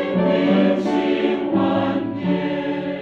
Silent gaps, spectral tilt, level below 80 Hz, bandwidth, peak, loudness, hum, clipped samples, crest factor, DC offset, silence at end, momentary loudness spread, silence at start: none; -8 dB/octave; -56 dBFS; 7.4 kHz; -6 dBFS; -20 LUFS; none; under 0.1%; 14 dB; under 0.1%; 0 s; 6 LU; 0 s